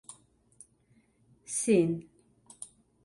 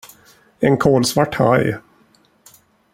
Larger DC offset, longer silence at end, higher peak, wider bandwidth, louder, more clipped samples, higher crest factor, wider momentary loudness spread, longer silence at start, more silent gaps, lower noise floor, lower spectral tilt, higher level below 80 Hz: neither; second, 0.4 s vs 1.15 s; second, -14 dBFS vs -2 dBFS; second, 11.5 kHz vs 16.5 kHz; second, -29 LUFS vs -16 LUFS; neither; about the same, 20 dB vs 18 dB; first, 22 LU vs 8 LU; second, 0.1 s vs 0.6 s; neither; first, -67 dBFS vs -56 dBFS; about the same, -5.5 dB/octave vs -5.5 dB/octave; second, -70 dBFS vs -50 dBFS